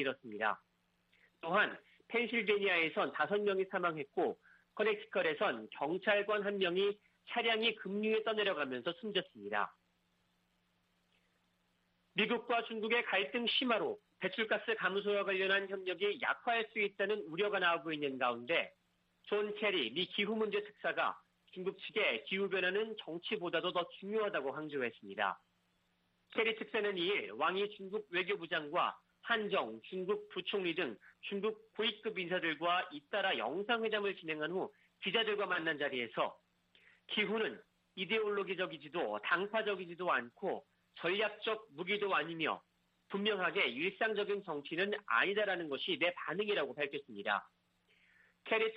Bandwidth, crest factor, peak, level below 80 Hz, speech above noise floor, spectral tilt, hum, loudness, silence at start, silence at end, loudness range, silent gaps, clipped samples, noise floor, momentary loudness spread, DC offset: 5.4 kHz; 20 dB; -18 dBFS; -86 dBFS; 41 dB; -6.5 dB/octave; none; -36 LUFS; 0 s; 0 s; 4 LU; none; under 0.1%; -78 dBFS; 8 LU; under 0.1%